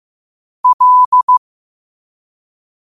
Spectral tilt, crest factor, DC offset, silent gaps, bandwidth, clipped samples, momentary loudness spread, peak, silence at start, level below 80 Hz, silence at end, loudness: -1 dB/octave; 12 dB; under 0.1%; 0.73-0.79 s, 1.06-1.12 s, 1.23-1.28 s; 1.3 kHz; under 0.1%; 6 LU; -4 dBFS; 0.65 s; -68 dBFS; 1.55 s; -10 LUFS